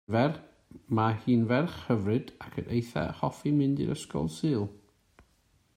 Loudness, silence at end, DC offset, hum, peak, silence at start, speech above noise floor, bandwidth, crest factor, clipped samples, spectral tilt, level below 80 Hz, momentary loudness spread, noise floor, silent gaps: -30 LUFS; 1 s; under 0.1%; none; -12 dBFS; 0.1 s; 39 dB; 15 kHz; 18 dB; under 0.1%; -7.5 dB/octave; -58 dBFS; 8 LU; -68 dBFS; none